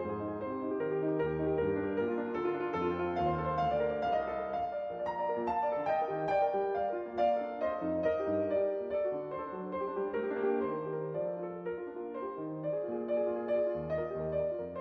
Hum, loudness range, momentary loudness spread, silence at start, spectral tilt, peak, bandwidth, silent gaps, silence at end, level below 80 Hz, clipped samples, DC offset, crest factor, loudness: none; 4 LU; 7 LU; 0 s; -9 dB/octave; -20 dBFS; 6.2 kHz; none; 0 s; -58 dBFS; under 0.1%; under 0.1%; 14 dB; -34 LUFS